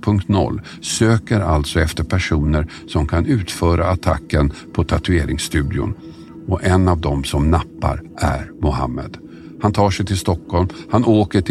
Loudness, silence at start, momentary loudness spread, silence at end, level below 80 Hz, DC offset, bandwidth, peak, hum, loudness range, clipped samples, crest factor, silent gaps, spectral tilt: -18 LUFS; 0 s; 8 LU; 0 s; -28 dBFS; under 0.1%; 13.5 kHz; -2 dBFS; none; 2 LU; under 0.1%; 16 dB; none; -6 dB/octave